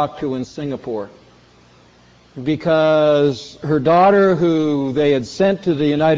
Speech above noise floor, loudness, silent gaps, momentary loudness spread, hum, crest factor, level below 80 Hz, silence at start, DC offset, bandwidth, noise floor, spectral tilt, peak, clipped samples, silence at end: 33 dB; -17 LUFS; none; 14 LU; none; 14 dB; -52 dBFS; 0 s; under 0.1%; 7.8 kHz; -49 dBFS; -7 dB/octave; -4 dBFS; under 0.1%; 0 s